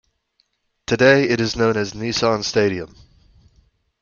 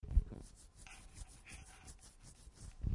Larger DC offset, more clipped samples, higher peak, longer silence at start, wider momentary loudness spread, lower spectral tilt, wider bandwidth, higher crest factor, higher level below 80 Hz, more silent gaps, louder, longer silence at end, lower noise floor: neither; neither; first, 0 dBFS vs -18 dBFS; first, 0.9 s vs 0.05 s; second, 14 LU vs 18 LU; about the same, -4.5 dB/octave vs -5.5 dB/octave; second, 7.4 kHz vs 11.5 kHz; about the same, 20 dB vs 24 dB; second, -50 dBFS vs -44 dBFS; neither; first, -18 LUFS vs -50 LUFS; first, 1.15 s vs 0 s; first, -67 dBFS vs -59 dBFS